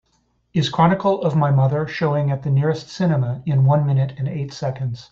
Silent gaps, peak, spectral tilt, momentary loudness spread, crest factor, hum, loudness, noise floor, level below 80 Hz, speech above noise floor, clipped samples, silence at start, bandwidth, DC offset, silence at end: none; -4 dBFS; -8 dB/octave; 9 LU; 16 dB; none; -20 LUFS; -65 dBFS; -52 dBFS; 46 dB; under 0.1%; 0.55 s; 7.4 kHz; under 0.1%; 0.05 s